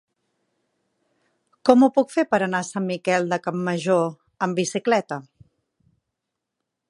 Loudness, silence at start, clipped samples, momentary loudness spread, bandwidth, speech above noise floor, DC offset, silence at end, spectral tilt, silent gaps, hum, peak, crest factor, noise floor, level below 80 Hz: -22 LUFS; 1.65 s; under 0.1%; 11 LU; 11.5 kHz; 62 dB; under 0.1%; 1.7 s; -5.5 dB/octave; none; none; 0 dBFS; 24 dB; -82 dBFS; -70 dBFS